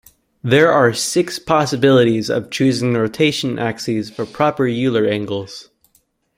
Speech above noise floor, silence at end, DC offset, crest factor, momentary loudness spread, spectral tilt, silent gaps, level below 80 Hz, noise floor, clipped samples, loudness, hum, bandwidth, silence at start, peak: 45 dB; 0.75 s; under 0.1%; 16 dB; 11 LU; -5 dB/octave; none; -54 dBFS; -61 dBFS; under 0.1%; -17 LUFS; none; 16 kHz; 0.45 s; -2 dBFS